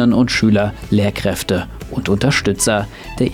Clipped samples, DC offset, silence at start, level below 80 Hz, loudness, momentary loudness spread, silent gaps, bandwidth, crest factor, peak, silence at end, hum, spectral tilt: under 0.1%; under 0.1%; 0 s; -34 dBFS; -17 LUFS; 8 LU; none; 17 kHz; 12 dB; -4 dBFS; 0 s; none; -5 dB/octave